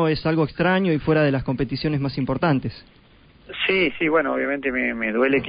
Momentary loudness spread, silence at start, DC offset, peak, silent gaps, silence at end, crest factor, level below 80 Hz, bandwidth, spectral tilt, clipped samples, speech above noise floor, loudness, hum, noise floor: 5 LU; 0 s; under 0.1%; -6 dBFS; none; 0 s; 16 dB; -46 dBFS; 5.2 kHz; -11.5 dB/octave; under 0.1%; 30 dB; -21 LUFS; none; -51 dBFS